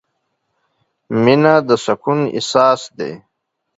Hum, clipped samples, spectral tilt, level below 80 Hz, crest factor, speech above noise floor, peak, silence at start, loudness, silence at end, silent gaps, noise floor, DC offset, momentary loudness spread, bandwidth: none; under 0.1%; -5.5 dB/octave; -60 dBFS; 16 dB; 60 dB; 0 dBFS; 1.1 s; -15 LUFS; 0.6 s; none; -74 dBFS; under 0.1%; 14 LU; 8 kHz